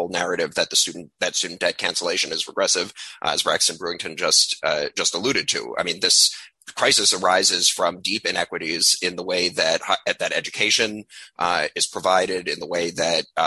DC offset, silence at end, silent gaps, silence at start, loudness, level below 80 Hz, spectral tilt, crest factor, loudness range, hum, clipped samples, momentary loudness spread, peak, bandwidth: under 0.1%; 0 s; none; 0 s; -20 LUFS; -62 dBFS; -0.5 dB/octave; 18 dB; 4 LU; none; under 0.1%; 9 LU; -4 dBFS; 13 kHz